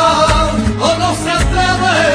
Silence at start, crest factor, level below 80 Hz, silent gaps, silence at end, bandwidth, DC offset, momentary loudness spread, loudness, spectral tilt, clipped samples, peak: 0 s; 12 dB; -22 dBFS; none; 0 s; 11 kHz; under 0.1%; 4 LU; -13 LUFS; -4.5 dB/octave; under 0.1%; 0 dBFS